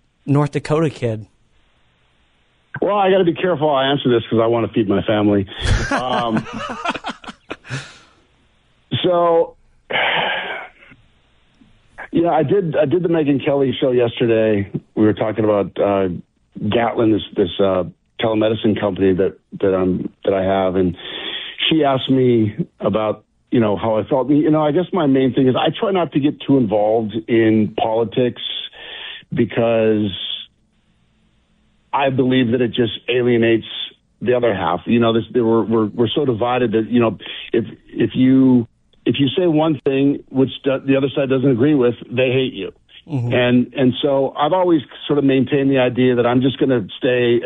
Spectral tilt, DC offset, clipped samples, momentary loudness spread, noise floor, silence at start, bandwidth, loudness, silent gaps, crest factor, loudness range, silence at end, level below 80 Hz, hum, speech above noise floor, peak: -7.5 dB/octave; under 0.1%; under 0.1%; 10 LU; -59 dBFS; 0.25 s; 10.5 kHz; -17 LUFS; none; 12 dB; 4 LU; 0 s; -42 dBFS; none; 43 dB; -6 dBFS